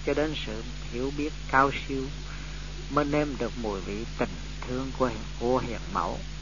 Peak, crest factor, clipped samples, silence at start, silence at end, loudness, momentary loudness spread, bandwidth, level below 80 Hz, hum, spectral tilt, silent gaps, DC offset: -6 dBFS; 24 dB; under 0.1%; 0 s; 0 s; -30 LUFS; 11 LU; 7.4 kHz; -38 dBFS; 50 Hz at -40 dBFS; -5.5 dB/octave; none; 0.7%